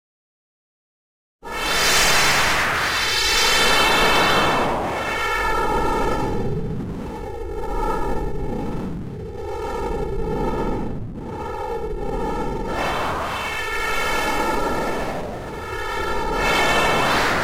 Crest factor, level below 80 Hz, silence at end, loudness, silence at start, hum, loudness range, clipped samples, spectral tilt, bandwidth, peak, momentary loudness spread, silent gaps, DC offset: 16 dB; -32 dBFS; 0 s; -21 LUFS; 1.45 s; none; 11 LU; under 0.1%; -3 dB/octave; 16 kHz; -4 dBFS; 15 LU; none; under 0.1%